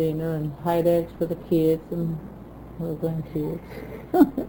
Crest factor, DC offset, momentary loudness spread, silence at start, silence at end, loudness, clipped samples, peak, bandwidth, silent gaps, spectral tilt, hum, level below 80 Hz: 20 dB; under 0.1%; 17 LU; 0 s; 0 s; -25 LUFS; under 0.1%; -6 dBFS; over 20 kHz; none; -9 dB/octave; none; -48 dBFS